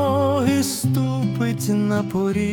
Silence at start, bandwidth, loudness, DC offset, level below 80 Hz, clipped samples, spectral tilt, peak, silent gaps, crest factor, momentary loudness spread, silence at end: 0 s; 18 kHz; -21 LUFS; under 0.1%; -54 dBFS; under 0.1%; -6 dB/octave; -6 dBFS; none; 14 dB; 3 LU; 0 s